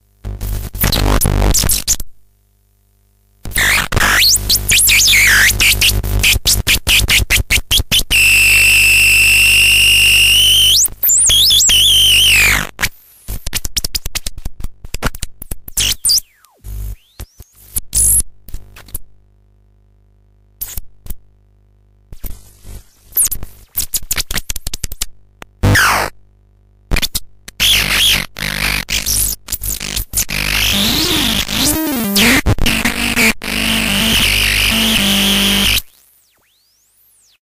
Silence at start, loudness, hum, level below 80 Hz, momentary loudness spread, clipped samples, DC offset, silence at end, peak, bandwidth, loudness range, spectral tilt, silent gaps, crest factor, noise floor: 0.25 s; -10 LUFS; 50 Hz at -30 dBFS; -24 dBFS; 18 LU; under 0.1%; under 0.1%; 1.6 s; 0 dBFS; 16.5 kHz; 13 LU; -1 dB/octave; none; 14 dB; -56 dBFS